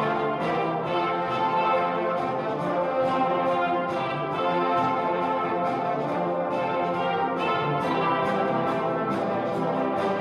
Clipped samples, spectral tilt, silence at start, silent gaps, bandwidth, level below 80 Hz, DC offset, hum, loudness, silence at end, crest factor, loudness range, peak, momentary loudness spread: under 0.1%; -7 dB/octave; 0 s; none; 12 kHz; -64 dBFS; under 0.1%; none; -25 LUFS; 0 s; 12 dB; 1 LU; -14 dBFS; 3 LU